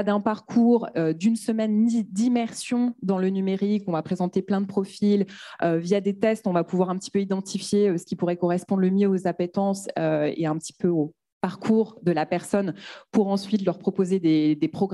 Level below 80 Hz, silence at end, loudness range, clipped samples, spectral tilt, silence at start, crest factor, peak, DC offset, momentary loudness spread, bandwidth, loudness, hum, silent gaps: -70 dBFS; 0 s; 2 LU; under 0.1%; -7 dB/octave; 0 s; 16 dB; -8 dBFS; under 0.1%; 6 LU; 12 kHz; -24 LUFS; none; 11.32-11.41 s